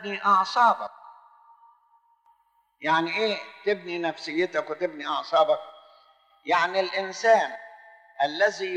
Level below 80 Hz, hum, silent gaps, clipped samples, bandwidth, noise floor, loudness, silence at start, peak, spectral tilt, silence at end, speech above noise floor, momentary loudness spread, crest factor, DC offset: -80 dBFS; none; none; under 0.1%; 9.4 kHz; -66 dBFS; -25 LUFS; 0 s; -8 dBFS; -3.5 dB/octave; 0 s; 42 dB; 10 LU; 18 dB; under 0.1%